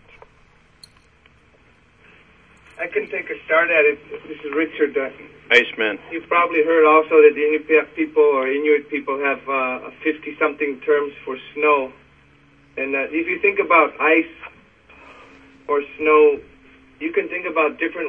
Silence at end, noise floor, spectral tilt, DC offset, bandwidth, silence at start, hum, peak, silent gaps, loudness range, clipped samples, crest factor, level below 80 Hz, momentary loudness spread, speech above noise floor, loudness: 0 s; -54 dBFS; -5 dB/octave; under 0.1%; 7 kHz; 2.75 s; none; 0 dBFS; none; 6 LU; under 0.1%; 20 dB; -60 dBFS; 15 LU; 36 dB; -18 LUFS